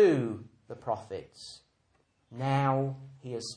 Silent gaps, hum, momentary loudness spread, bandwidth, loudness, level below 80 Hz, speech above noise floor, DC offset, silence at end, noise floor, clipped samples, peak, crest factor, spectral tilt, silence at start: none; none; 20 LU; 10 kHz; -32 LUFS; -70 dBFS; 42 dB; under 0.1%; 0 s; -72 dBFS; under 0.1%; -12 dBFS; 18 dB; -6.5 dB/octave; 0 s